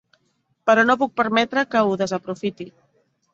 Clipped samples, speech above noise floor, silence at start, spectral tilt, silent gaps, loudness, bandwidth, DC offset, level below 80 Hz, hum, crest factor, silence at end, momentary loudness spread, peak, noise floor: under 0.1%; 48 dB; 0.65 s; -5 dB/octave; none; -20 LUFS; 7.8 kHz; under 0.1%; -64 dBFS; none; 20 dB; 0.65 s; 13 LU; -2 dBFS; -68 dBFS